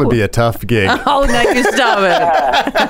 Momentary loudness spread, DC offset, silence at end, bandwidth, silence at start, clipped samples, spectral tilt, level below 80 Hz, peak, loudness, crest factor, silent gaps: 3 LU; under 0.1%; 0 s; 16.5 kHz; 0 s; under 0.1%; -5 dB/octave; -28 dBFS; 0 dBFS; -12 LUFS; 12 dB; none